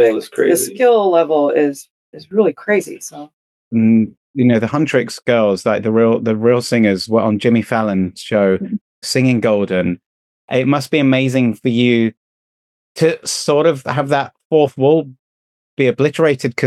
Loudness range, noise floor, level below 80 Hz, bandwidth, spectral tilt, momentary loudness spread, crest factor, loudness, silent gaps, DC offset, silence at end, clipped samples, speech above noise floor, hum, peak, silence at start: 2 LU; under -90 dBFS; -60 dBFS; 13 kHz; -5.5 dB/octave; 7 LU; 14 dB; -15 LUFS; 1.90-2.13 s, 3.33-3.71 s, 4.17-4.34 s, 8.81-9.02 s, 10.06-10.48 s, 12.17-12.95 s, 14.45-14.50 s, 15.19-15.77 s; under 0.1%; 0 s; under 0.1%; over 76 dB; none; -2 dBFS; 0 s